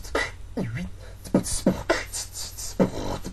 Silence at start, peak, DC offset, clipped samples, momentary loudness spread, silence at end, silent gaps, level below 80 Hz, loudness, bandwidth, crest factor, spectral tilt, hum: 0 s; -8 dBFS; 0.4%; under 0.1%; 9 LU; 0 s; none; -40 dBFS; -28 LUFS; 14 kHz; 20 dB; -4.5 dB/octave; none